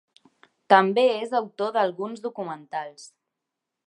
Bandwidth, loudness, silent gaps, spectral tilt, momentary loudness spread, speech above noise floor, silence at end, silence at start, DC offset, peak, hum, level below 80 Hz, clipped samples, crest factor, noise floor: 10.5 kHz; -24 LUFS; none; -5 dB/octave; 15 LU; 61 dB; 0.8 s; 0.7 s; under 0.1%; -2 dBFS; none; -84 dBFS; under 0.1%; 24 dB; -84 dBFS